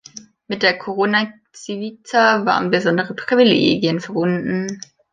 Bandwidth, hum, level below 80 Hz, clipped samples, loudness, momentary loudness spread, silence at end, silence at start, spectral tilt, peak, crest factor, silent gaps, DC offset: 9.4 kHz; none; -60 dBFS; under 0.1%; -18 LUFS; 15 LU; 0.35 s; 0.15 s; -5 dB/octave; -2 dBFS; 18 dB; none; under 0.1%